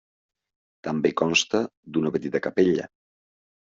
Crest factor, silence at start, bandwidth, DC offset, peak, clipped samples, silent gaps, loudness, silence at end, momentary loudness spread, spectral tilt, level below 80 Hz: 20 dB; 0.85 s; 7.8 kHz; under 0.1%; -6 dBFS; under 0.1%; 1.77-1.83 s; -24 LUFS; 0.85 s; 9 LU; -3.5 dB/octave; -66 dBFS